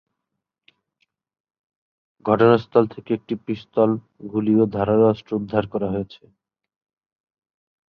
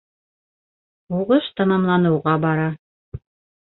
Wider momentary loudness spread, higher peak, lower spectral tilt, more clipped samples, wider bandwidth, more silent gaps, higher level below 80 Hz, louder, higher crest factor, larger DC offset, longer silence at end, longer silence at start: second, 12 LU vs 22 LU; about the same, -2 dBFS vs -4 dBFS; second, -10 dB/octave vs -12 dB/octave; neither; first, 5.6 kHz vs 4.1 kHz; second, none vs 2.79-3.12 s; about the same, -56 dBFS vs -54 dBFS; about the same, -21 LUFS vs -19 LUFS; about the same, 20 dB vs 18 dB; neither; first, 1.75 s vs 0.5 s; first, 2.25 s vs 1.1 s